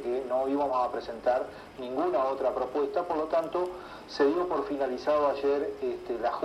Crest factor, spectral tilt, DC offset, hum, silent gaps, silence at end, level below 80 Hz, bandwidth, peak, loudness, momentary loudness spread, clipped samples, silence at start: 16 dB; -5.5 dB/octave; under 0.1%; none; none; 0 s; -60 dBFS; 13 kHz; -12 dBFS; -29 LUFS; 8 LU; under 0.1%; 0 s